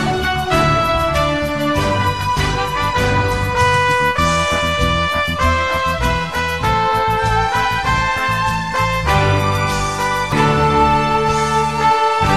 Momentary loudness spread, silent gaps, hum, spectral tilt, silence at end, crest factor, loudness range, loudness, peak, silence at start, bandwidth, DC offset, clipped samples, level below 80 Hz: 4 LU; none; none; -4.5 dB/octave; 0 s; 14 dB; 1 LU; -16 LUFS; -2 dBFS; 0 s; 13.5 kHz; 1%; under 0.1%; -28 dBFS